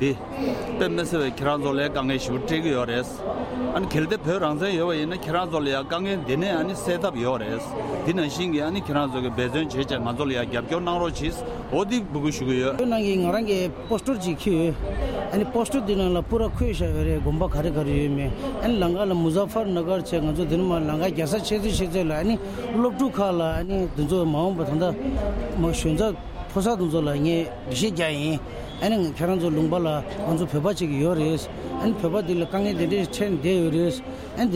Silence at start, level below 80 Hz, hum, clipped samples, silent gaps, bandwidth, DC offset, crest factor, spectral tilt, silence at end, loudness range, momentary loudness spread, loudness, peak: 0 s; -38 dBFS; none; under 0.1%; none; 16 kHz; under 0.1%; 16 dB; -6 dB/octave; 0 s; 2 LU; 5 LU; -25 LUFS; -8 dBFS